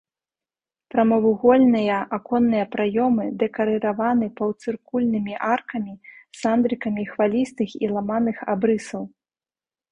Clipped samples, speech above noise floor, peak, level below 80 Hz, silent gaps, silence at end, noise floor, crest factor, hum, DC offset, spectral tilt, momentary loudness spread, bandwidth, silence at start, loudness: under 0.1%; over 69 dB; -4 dBFS; -60 dBFS; none; 0.85 s; under -90 dBFS; 18 dB; none; under 0.1%; -7 dB/octave; 9 LU; 10 kHz; 0.95 s; -22 LUFS